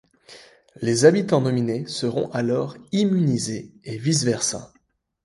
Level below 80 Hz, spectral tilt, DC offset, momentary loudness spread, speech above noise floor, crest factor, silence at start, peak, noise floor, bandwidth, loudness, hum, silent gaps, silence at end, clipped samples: -62 dBFS; -5 dB/octave; under 0.1%; 12 LU; 44 dB; 20 dB; 0.3 s; -2 dBFS; -65 dBFS; 11.5 kHz; -22 LUFS; none; none; 0.6 s; under 0.1%